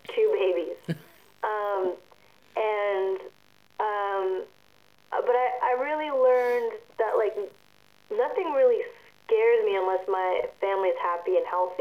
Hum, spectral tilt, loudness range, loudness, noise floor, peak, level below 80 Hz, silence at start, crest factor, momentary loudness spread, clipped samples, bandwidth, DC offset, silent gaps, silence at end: 50 Hz at -75 dBFS; -6.5 dB/octave; 5 LU; -26 LUFS; -61 dBFS; -12 dBFS; -74 dBFS; 0.1 s; 14 dB; 13 LU; under 0.1%; 14.5 kHz; under 0.1%; none; 0 s